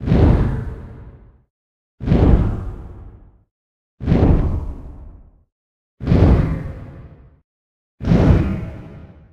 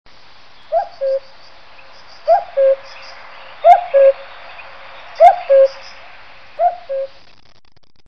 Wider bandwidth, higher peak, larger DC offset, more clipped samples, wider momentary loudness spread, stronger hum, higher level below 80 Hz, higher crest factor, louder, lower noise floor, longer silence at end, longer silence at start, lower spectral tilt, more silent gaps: about the same, 6.6 kHz vs 6.4 kHz; about the same, 0 dBFS vs 0 dBFS; second, under 0.1% vs 1%; second, under 0.1% vs 0.2%; about the same, 23 LU vs 25 LU; neither; first, -24 dBFS vs -56 dBFS; about the same, 18 dB vs 16 dB; second, -18 LUFS vs -14 LUFS; second, -42 dBFS vs -51 dBFS; second, 0.35 s vs 1 s; second, 0 s vs 0.7 s; first, -10 dB/octave vs -2.5 dB/octave; first, 1.50-1.98 s, 3.51-3.98 s, 5.52-5.98 s, 7.44-7.98 s vs none